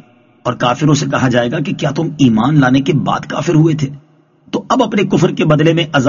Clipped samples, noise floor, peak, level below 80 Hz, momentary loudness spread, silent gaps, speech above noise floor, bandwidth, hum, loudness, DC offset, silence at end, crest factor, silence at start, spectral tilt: under 0.1%; -48 dBFS; 0 dBFS; -46 dBFS; 8 LU; none; 35 dB; 7.4 kHz; none; -13 LUFS; under 0.1%; 0 s; 14 dB; 0.45 s; -5.5 dB/octave